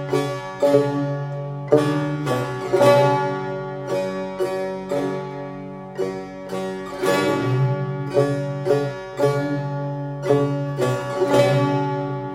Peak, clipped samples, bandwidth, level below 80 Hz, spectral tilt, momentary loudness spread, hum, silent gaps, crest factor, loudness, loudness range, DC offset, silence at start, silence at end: -2 dBFS; under 0.1%; 16 kHz; -56 dBFS; -7 dB/octave; 11 LU; none; none; 20 dB; -22 LUFS; 6 LU; under 0.1%; 0 s; 0 s